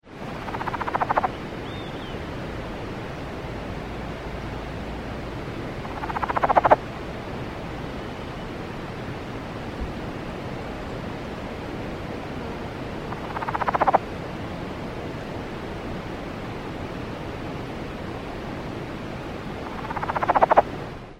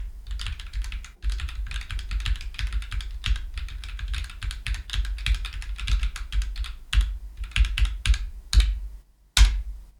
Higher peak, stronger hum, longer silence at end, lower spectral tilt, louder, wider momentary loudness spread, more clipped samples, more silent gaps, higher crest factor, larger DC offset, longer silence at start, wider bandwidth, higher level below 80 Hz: about the same, -2 dBFS vs -4 dBFS; neither; about the same, 0 s vs 0.1 s; first, -6.5 dB/octave vs -2.5 dB/octave; about the same, -29 LUFS vs -29 LUFS; about the same, 12 LU vs 12 LU; neither; neither; about the same, 26 dB vs 22 dB; neither; about the same, 0.05 s vs 0 s; first, 16 kHz vs 13 kHz; second, -42 dBFS vs -26 dBFS